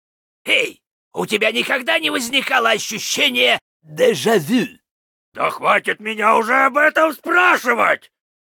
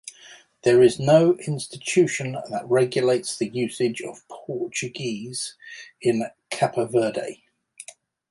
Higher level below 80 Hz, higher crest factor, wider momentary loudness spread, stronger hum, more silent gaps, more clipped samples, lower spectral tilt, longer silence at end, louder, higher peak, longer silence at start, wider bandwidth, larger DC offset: about the same, -68 dBFS vs -64 dBFS; about the same, 16 dB vs 18 dB; second, 9 LU vs 21 LU; neither; first, 0.91-1.11 s, 3.61-3.80 s, 4.91-5.32 s vs none; neither; second, -2.5 dB/octave vs -5 dB/octave; about the same, 0.5 s vs 0.5 s; first, -16 LUFS vs -23 LUFS; about the same, -2 dBFS vs -4 dBFS; first, 0.45 s vs 0.05 s; first, 19 kHz vs 11.5 kHz; neither